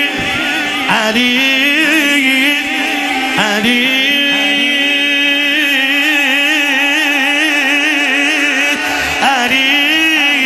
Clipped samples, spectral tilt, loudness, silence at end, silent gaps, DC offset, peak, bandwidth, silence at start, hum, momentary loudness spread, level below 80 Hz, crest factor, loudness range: under 0.1%; -1.5 dB/octave; -10 LUFS; 0 s; none; under 0.1%; 0 dBFS; 15.5 kHz; 0 s; none; 4 LU; -48 dBFS; 12 dB; 1 LU